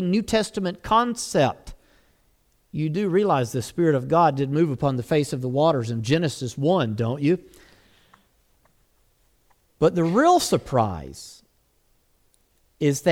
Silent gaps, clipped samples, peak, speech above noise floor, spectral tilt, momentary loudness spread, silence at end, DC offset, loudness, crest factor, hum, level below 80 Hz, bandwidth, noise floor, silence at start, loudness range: none; under 0.1%; -6 dBFS; 43 dB; -6 dB/octave; 8 LU; 0 s; under 0.1%; -22 LUFS; 18 dB; none; -52 dBFS; 17 kHz; -64 dBFS; 0 s; 5 LU